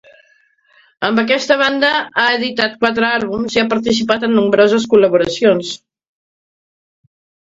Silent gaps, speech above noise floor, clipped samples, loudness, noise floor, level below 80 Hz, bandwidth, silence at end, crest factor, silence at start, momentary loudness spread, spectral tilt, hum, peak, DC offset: none; 41 dB; under 0.1%; -14 LUFS; -55 dBFS; -54 dBFS; 7.8 kHz; 1.7 s; 16 dB; 1 s; 6 LU; -4 dB/octave; none; 0 dBFS; under 0.1%